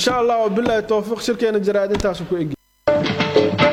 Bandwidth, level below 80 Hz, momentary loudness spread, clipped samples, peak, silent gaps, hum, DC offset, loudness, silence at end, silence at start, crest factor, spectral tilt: 15.5 kHz; -42 dBFS; 7 LU; under 0.1%; -2 dBFS; none; none; under 0.1%; -19 LUFS; 0 s; 0 s; 16 dB; -5 dB/octave